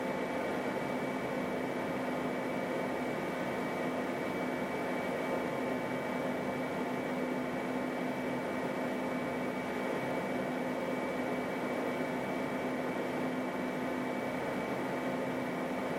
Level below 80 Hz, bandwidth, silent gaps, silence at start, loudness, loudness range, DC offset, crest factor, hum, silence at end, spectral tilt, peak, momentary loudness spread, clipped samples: -68 dBFS; 16.5 kHz; none; 0 s; -35 LUFS; 0 LU; under 0.1%; 14 dB; none; 0 s; -6 dB/octave; -22 dBFS; 1 LU; under 0.1%